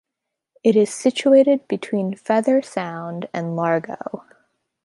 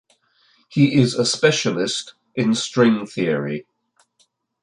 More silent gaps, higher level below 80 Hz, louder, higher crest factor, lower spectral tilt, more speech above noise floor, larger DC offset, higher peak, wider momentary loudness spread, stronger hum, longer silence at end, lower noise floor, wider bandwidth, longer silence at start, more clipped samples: neither; second, -72 dBFS vs -62 dBFS; about the same, -20 LUFS vs -19 LUFS; about the same, 16 dB vs 18 dB; about the same, -6 dB/octave vs -5 dB/octave; first, 63 dB vs 46 dB; neither; about the same, -4 dBFS vs -2 dBFS; first, 15 LU vs 11 LU; neither; second, 0.65 s vs 1 s; first, -82 dBFS vs -64 dBFS; about the same, 11.5 kHz vs 11 kHz; about the same, 0.65 s vs 0.7 s; neither